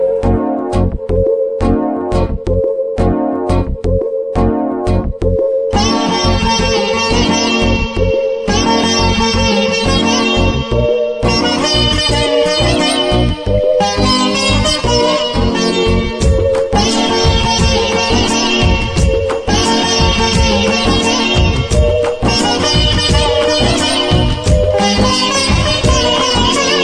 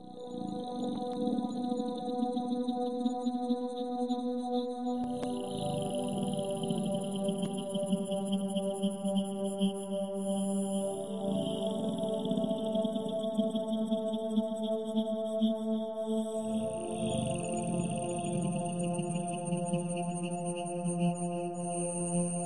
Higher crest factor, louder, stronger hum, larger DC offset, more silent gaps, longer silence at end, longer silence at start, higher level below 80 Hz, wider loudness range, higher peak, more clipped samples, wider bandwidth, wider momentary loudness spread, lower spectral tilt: about the same, 12 dB vs 16 dB; first, -13 LUFS vs -34 LUFS; neither; second, under 0.1% vs 0.2%; neither; about the same, 0 s vs 0 s; about the same, 0 s vs 0 s; first, -20 dBFS vs -68 dBFS; about the same, 3 LU vs 1 LU; first, 0 dBFS vs -18 dBFS; neither; first, 13 kHz vs 11.5 kHz; about the same, 4 LU vs 3 LU; second, -4.5 dB/octave vs -6 dB/octave